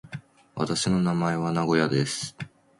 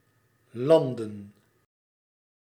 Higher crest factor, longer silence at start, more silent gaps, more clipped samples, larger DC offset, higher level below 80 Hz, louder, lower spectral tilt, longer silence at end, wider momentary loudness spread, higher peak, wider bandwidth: about the same, 18 dB vs 22 dB; second, 0.05 s vs 0.55 s; neither; neither; neither; first, -58 dBFS vs -78 dBFS; about the same, -25 LUFS vs -24 LUFS; second, -5 dB/octave vs -7.5 dB/octave; second, 0.35 s vs 1.15 s; second, 18 LU vs 22 LU; about the same, -8 dBFS vs -8 dBFS; second, 11.5 kHz vs 13.5 kHz